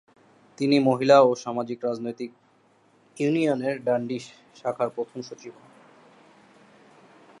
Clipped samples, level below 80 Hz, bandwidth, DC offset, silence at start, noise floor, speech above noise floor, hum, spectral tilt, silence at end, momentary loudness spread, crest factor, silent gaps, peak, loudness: under 0.1%; -78 dBFS; 11 kHz; under 0.1%; 0.6 s; -61 dBFS; 37 dB; none; -6 dB/octave; 1.9 s; 21 LU; 22 dB; none; -4 dBFS; -24 LUFS